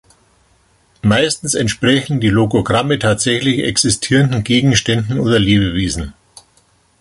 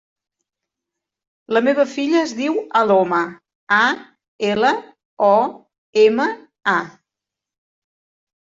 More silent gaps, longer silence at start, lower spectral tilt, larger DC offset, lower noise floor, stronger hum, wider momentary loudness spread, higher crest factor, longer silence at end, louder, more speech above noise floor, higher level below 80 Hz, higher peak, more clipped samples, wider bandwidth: second, none vs 3.55-3.67 s, 4.28-4.39 s, 5.05-5.17 s, 5.78-5.93 s; second, 1.05 s vs 1.5 s; about the same, -4.5 dB/octave vs -4.5 dB/octave; neither; second, -55 dBFS vs -86 dBFS; neither; second, 5 LU vs 9 LU; about the same, 14 dB vs 18 dB; second, 0.9 s vs 1.55 s; first, -14 LUFS vs -18 LUFS; second, 41 dB vs 69 dB; first, -36 dBFS vs -66 dBFS; about the same, 0 dBFS vs -2 dBFS; neither; first, 11.5 kHz vs 7.8 kHz